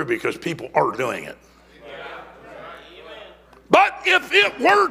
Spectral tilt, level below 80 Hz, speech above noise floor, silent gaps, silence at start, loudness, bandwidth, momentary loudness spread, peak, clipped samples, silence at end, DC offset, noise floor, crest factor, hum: -3.5 dB/octave; -58 dBFS; 26 dB; none; 0 s; -19 LUFS; 16 kHz; 24 LU; 0 dBFS; under 0.1%; 0 s; under 0.1%; -45 dBFS; 22 dB; none